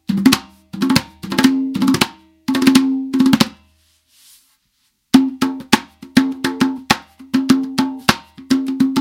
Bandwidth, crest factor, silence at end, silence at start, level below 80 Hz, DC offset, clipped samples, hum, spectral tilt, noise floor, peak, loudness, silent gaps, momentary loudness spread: 17 kHz; 18 dB; 0 s; 0.1 s; -48 dBFS; under 0.1%; under 0.1%; none; -4 dB/octave; -65 dBFS; 0 dBFS; -17 LUFS; none; 7 LU